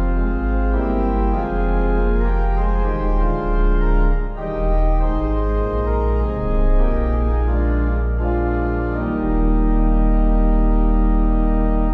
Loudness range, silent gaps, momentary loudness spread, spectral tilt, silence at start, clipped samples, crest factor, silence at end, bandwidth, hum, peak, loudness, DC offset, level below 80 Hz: 1 LU; none; 3 LU; -10.5 dB/octave; 0 s; under 0.1%; 10 dB; 0 s; 3.5 kHz; none; -6 dBFS; -20 LUFS; under 0.1%; -18 dBFS